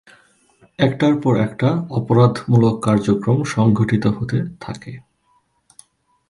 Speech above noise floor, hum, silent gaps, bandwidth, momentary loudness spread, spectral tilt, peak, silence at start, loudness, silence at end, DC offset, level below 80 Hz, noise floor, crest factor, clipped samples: 46 dB; none; none; 11.5 kHz; 12 LU; -7.5 dB/octave; -2 dBFS; 0.8 s; -17 LUFS; 1.3 s; under 0.1%; -50 dBFS; -62 dBFS; 18 dB; under 0.1%